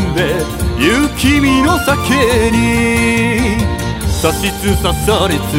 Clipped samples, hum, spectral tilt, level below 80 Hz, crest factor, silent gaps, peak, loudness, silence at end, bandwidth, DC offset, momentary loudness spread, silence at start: under 0.1%; none; -5 dB/octave; -24 dBFS; 12 dB; none; 0 dBFS; -13 LUFS; 0 s; 16.5 kHz; under 0.1%; 5 LU; 0 s